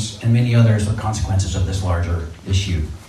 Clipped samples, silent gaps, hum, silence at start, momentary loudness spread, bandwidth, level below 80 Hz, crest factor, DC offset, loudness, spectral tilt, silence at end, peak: under 0.1%; none; none; 0 s; 8 LU; 12 kHz; -32 dBFS; 16 dB; under 0.1%; -19 LUFS; -6 dB/octave; 0 s; -2 dBFS